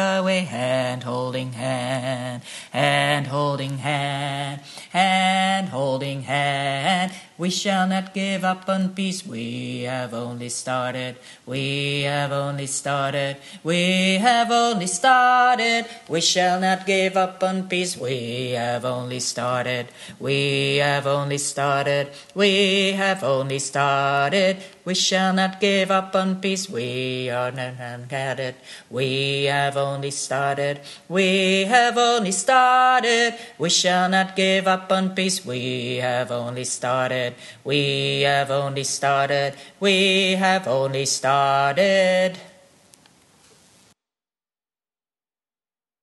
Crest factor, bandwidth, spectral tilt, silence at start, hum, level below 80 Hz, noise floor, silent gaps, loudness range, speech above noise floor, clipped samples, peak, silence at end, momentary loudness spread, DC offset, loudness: 20 dB; 12.5 kHz; -3.5 dB/octave; 0 s; none; -68 dBFS; under -90 dBFS; none; 7 LU; over 68 dB; under 0.1%; -2 dBFS; 3.55 s; 11 LU; under 0.1%; -21 LUFS